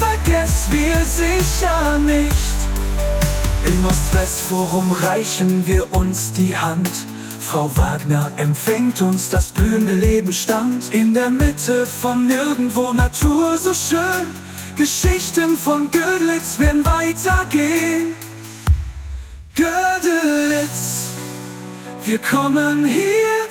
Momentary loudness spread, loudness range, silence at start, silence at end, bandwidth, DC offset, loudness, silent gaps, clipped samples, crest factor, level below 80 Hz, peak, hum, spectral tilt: 7 LU; 2 LU; 0 s; 0 s; 18 kHz; under 0.1%; -18 LUFS; none; under 0.1%; 14 dB; -24 dBFS; -2 dBFS; none; -5 dB/octave